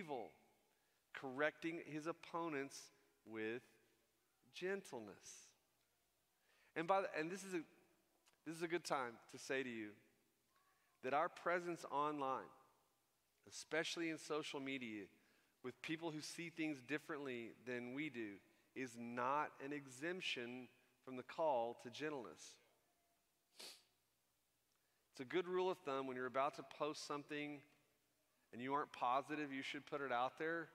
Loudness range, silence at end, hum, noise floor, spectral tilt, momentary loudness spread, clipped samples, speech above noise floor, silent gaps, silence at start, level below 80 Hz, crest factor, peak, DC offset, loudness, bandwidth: 5 LU; 0 s; none; -85 dBFS; -4 dB/octave; 16 LU; under 0.1%; 39 dB; none; 0 s; under -90 dBFS; 24 dB; -24 dBFS; under 0.1%; -46 LUFS; 15.5 kHz